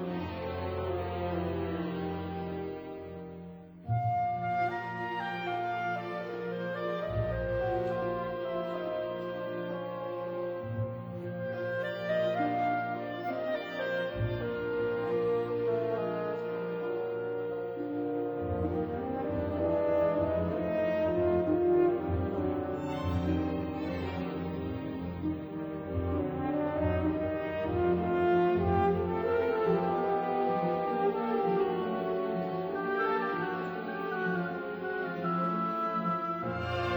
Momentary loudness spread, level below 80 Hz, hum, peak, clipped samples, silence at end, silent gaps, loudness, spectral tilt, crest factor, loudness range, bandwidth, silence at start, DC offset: 8 LU; -52 dBFS; none; -16 dBFS; under 0.1%; 0 s; none; -32 LUFS; -9 dB/octave; 16 dB; 6 LU; over 20 kHz; 0 s; under 0.1%